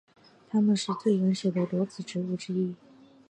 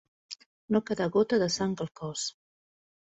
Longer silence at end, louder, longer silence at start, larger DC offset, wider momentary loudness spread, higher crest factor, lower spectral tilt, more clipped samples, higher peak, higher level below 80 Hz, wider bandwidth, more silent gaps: second, 0.55 s vs 0.8 s; about the same, -28 LUFS vs -29 LUFS; first, 0.55 s vs 0.3 s; neither; second, 8 LU vs 19 LU; about the same, 16 dB vs 18 dB; first, -6.5 dB/octave vs -4.5 dB/octave; neither; about the same, -14 dBFS vs -12 dBFS; second, -76 dBFS vs -66 dBFS; first, 10 kHz vs 8.4 kHz; second, none vs 0.46-0.68 s